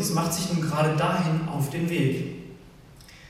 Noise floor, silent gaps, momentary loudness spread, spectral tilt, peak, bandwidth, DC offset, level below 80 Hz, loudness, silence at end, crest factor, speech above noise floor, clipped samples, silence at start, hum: -49 dBFS; none; 11 LU; -5.5 dB/octave; -12 dBFS; 15.5 kHz; under 0.1%; -54 dBFS; -26 LUFS; 0 s; 14 dB; 24 dB; under 0.1%; 0 s; none